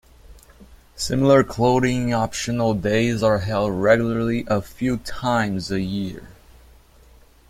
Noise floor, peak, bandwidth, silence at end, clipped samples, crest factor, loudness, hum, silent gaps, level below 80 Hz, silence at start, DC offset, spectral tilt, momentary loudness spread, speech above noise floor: -50 dBFS; -2 dBFS; 16 kHz; 1.2 s; under 0.1%; 20 dB; -21 LUFS; none; none; -44 dBFS; 0.3 s; under 0.1%; -6 dB/octave; 9 LU; 30 dB